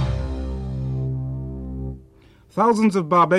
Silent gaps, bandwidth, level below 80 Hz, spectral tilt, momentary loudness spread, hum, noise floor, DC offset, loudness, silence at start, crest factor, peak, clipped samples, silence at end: none; 11.5 kHz; -34 dBFS; -7.5 dB/octave; 14 LU; none; -51 dBFS; under 0.1%; -23 LUFS; 0 s; 16 dB; -6 dBFS; under 0.1%; 0 s